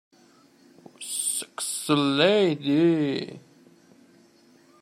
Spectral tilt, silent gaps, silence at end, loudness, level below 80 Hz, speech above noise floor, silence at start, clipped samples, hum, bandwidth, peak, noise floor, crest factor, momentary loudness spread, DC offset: -4 dB/octave; none; 1.45 s; -24 LUFS; -74 dBFS; 35 dB; 1 s; under 0.1%; none; 15.5 kHz; -6 dBFS; -57 dBFS; 20 dB; 12 LU; under 0.1%